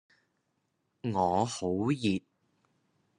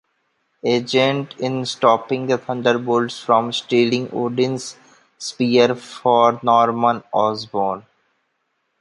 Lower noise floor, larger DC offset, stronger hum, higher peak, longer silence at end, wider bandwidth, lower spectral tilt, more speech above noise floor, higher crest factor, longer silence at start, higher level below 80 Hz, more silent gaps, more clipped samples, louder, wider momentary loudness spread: first, -78 dBFS vs -71 dBFS; neither; neither; second, -14 dBFS vs -2 dBFS; about the same, 1 s vs 1 s; about the same, 11.5 kHz vs 11.5 kHz; about the same, -6 dB/octave vs -5 dB/octave; about the same, 49 dB vs 52 dB; about the same, 20 dB vs 18 dB; first, 1.05 s vs 0.65 s; second, -72 dBFS vs -66 dBFS; neither; neither; second, -31 LUFS vs -19 LUFS; about the same, 7 LU vs 9 LU